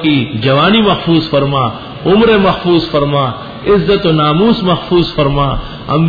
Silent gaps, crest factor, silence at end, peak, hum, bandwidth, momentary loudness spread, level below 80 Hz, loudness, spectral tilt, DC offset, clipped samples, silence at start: none; 10 dB; 0 s; 0 dBFS; none; 5 kHz; 8 LU; -30 dBFS; -11 LUFS; -8.5 dB/octave; under 0.1%; under 0.1%; 0 s